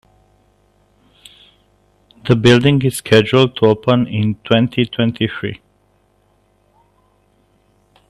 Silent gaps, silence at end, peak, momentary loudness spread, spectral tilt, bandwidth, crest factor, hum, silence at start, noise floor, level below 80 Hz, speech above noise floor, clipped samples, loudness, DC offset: none; 2.55 s; 0 dBFS; 12 LU; -6 dB/octave; 13 kHz; 18 dB; 50 Hz at -45 dBFS; 2.25 s; -58 dBFS; -50 dBFS; 44 dB; under 0.1%; -14 LUFS; under 0.1%